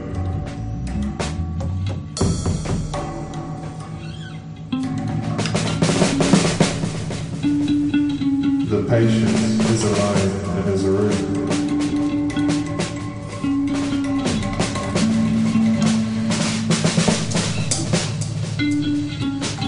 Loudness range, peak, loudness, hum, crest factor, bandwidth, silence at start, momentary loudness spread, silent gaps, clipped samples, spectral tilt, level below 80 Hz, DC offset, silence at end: 6 LU; -2 dBFS; -21 LUFS; none; 18 dB; 11 kHz; 0 s; 10 LU; none; under 0.1%; -5.5 dB/octave; -38 dBFS; under 0.1%; 0 s